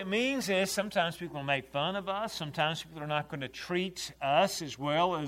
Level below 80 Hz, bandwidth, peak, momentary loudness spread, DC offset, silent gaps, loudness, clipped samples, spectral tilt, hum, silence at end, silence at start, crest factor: -64 dBFS; 16 kHz; -12 dBFS; 8 LU; under 0.1%; none; -32 LUFS; under 0.1%; -4 dB/octave; none; 0 s; 0 s; 20 dB